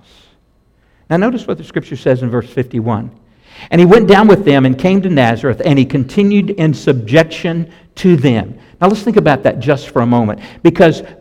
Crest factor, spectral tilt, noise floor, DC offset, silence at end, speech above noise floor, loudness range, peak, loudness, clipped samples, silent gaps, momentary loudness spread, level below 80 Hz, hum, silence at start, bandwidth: 12 dB; -7.5 dB/octave; -53 dBFS; under 0.1%; 0.05 s; 42 dB; 7 LU; 0 dBFS; -12 LUFS; 0.2%; none; 12 LU; -42 dBFS; none; 1.1 s; 11.5 kHz